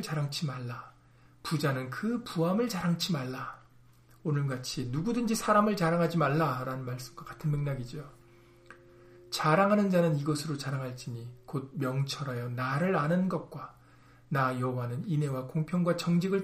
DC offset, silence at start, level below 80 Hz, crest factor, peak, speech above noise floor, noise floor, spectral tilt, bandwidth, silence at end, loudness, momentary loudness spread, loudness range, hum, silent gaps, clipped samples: under 0.1%; 0 s; -60 dBFS; 20 dB; -12 dBFS; 29 dB; -59 dBFS; -6 dB/octave; 15.5 kHz; 0 s; -31 LUFS; 15 LU; 3 LU; none; none; under 0.1%